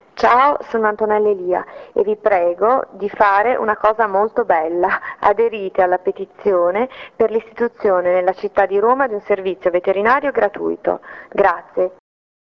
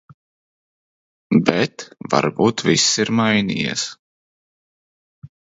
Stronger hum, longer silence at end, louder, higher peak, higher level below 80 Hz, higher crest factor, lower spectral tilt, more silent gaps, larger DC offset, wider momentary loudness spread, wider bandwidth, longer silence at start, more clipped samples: neither; first, 0.55 s vs 0.35 s; about the same, -17 LUFS vs -18 LUFS; about the same, -2 dBFS vs 0 dBFS; about the same, -54 dBFS vs -56 dBFS; second, 16 dB vs 22 dB; first, -6.5 dB/octave vs -4 dB/octave; second, none vs 3.99-5.22 s; neither; about the same, 7 LU vs 9 LU; second, 6.6 kHz vs 8 kHz; second, 0.15 s vs 1.3 s; neither